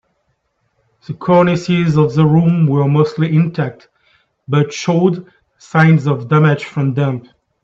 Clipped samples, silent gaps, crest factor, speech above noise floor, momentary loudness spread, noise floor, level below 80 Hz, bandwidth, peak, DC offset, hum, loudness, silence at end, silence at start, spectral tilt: under 0.1%; none; 14 dB; 52 dB; 9 LU; -66 dBFS; -54 dBFS; 7.6 kHz; 0 dBFS; under 0.1%; none; -14 LUFS; 0.45 s; 1.1 s; -8 dB/octave